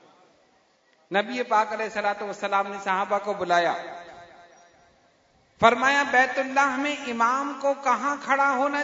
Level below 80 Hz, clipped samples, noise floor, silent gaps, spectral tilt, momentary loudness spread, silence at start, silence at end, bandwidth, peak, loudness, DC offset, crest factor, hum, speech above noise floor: -68 dBFS; under 0.1%; -63 dBFS; none; -3.5 dB/octave; 8 LU; 1.1 s; 0 s; 7.8 kHz; -2 dBFS; -24 LUFS; under 0.1%; 22 dB; none; 39 dB